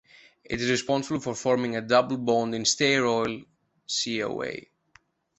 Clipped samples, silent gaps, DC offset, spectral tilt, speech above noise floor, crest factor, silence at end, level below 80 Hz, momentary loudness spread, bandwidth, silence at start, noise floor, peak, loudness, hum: under 0.1%; none; under 0.1%; -3.5 dB/octave; 36 dB; 20 dB; 0.8 s; -60 dBFS; 11 LU; 8.4 kHz; 0.5 s; -62 dBFS; -6 dBFS; -26 LUFS; none